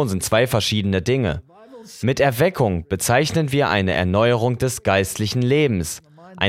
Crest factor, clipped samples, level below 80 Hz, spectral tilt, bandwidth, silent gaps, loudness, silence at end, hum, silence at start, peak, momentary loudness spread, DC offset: 18 dB; under 0.1%; -44 dBFS; -5 dB/octave; 16.5 kHz; none; -19 LUFS; 0 s; none; 0 s; -2 dBFS; 7 LU; under 0.1%